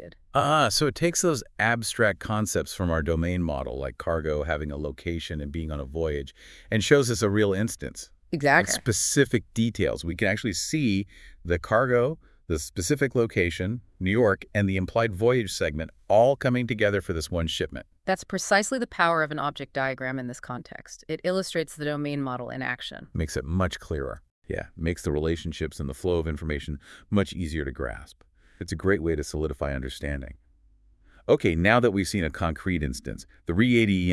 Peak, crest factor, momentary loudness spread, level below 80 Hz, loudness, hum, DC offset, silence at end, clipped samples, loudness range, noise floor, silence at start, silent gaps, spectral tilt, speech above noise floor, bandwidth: -4 dBFS; 22 dB; 14 LU; -44 dBFS; -26 LUFS; none; under 0.1%; 0 s; under 0.1%; 6 LU; -59 dBFS; 0 s; 24.31-24.42 s; -5 dB/octave; 33 dB; 12 kHz